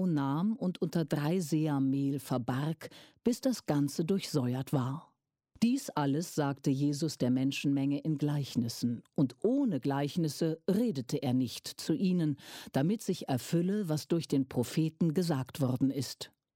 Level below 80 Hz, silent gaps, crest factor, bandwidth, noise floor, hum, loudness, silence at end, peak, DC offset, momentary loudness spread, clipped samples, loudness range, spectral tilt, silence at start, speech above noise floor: -72 dBFS; none; 16 dB; 16.5 kHz; -67 dBFS; none; -32 LUFS; 0.3 s; -16 dBFS; under 0.1%; 4 LU; under 0.1%; 1 LU; -6.5 dB/octave; 0 s; 35 dB